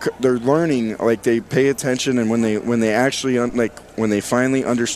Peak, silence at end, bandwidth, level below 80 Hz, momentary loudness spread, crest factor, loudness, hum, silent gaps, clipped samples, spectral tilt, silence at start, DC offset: -4 dBFS; 0 s; 14.5 kHz; -52 dBFS; 3 LU; 16 dB; -19 LUFS; none; none; under 0.1%; -5 dB/octave; 0 s; under 0.1%